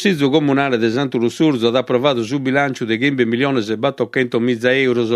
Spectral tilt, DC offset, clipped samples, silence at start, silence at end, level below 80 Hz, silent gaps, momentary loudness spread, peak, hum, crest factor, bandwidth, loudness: -6 dB/octave; under 0.1%; under 0.1%; 0 s; 0 s; -60 dBFS; none; 4 LU; 0 dBFS; none; 16 dB; 13 kHz; -17 LUFS